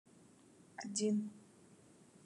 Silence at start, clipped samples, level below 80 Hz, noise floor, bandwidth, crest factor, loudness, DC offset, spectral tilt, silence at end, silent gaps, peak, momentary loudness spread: 0.8 s; under 0.1%; under -90 dBFS; -64 dBFS; 11.5 kHz; 18 dB; -40 LUFS; under 0.1%; -4.5 dB/octave; 0.85 s; none; -24 dBFS; 20 LU